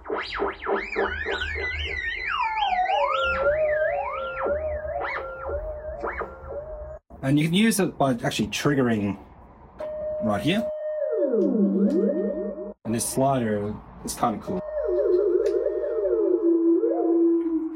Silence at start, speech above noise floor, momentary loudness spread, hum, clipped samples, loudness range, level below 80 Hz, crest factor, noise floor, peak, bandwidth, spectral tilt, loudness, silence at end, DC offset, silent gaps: 0 s; 23 dB; 11 LU; none; under 0.1%; 3 LU; -46 dBFS; 16 dB; -48 dBFS; -8 dBFS; 16 kHz; -5.5 dB/octave; -25 LUFS; 0 s; under 0.1%; none